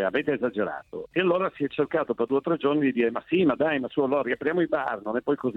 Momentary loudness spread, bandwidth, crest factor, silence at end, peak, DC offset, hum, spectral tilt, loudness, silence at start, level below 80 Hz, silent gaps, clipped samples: 5 LU; 4.5 kHz; 14 dB; 0 s; -10 dBFS; under 0.1%; none; -8.5 dB/octave; -26 LUFS; 0 s; -64 dBFS; none; under 0.1%